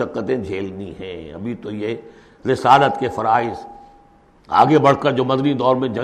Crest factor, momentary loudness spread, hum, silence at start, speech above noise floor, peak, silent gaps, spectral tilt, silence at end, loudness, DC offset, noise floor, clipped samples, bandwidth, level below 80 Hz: 18 dB; 18 LU; none; 0 s; 33 dB; -2 dBFS; none; -7 dB/octave; 0 s; -18 LUFS; under 0.1%; -51 dBFS; under 0.1%; 11.5 kHz; -52 dBFS